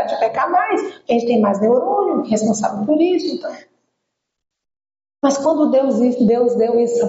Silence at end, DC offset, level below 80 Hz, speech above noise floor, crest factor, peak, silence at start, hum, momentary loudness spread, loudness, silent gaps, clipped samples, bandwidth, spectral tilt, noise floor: 0 s; under 0.1%; -64 dBFS; 60 dB; 12 dB; -4 dBFS; 0 s; none; 5 LU; -17 LUFS; none; under 0.1%; 8 kHz; -5.5 dB/octave; -76 dBFS